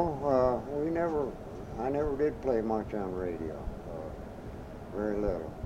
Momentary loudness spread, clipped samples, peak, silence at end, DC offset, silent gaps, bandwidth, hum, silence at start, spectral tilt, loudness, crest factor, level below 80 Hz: 15 LU; under 0.1%; -14 dBFS; 0 s; under 0.1%; none; 15.5 kHz; none; 0 s; -8.5 dB/octave; -33 LUFS; 18 dB; -46 dBFS